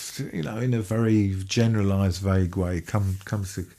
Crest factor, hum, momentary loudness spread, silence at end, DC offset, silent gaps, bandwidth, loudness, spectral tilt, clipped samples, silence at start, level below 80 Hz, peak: 16 dB; none; 8 LU; 0.1 s; under 0.1%; none; 14.5 kHz; -25 LUFS; -6.5 dB/octave; under 0.1%; 0 s; -48 dBFS; -8 dBFS